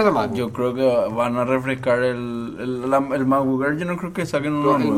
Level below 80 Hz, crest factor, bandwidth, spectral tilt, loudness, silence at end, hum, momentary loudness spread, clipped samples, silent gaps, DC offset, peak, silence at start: -54 dBFS; 16 dB; 15 kHz; -7 dB/octave; -21 LUFS; 0 s; none; 7 LU; under 0.1%; none; under 0.1%; -4 dBFS; 0 s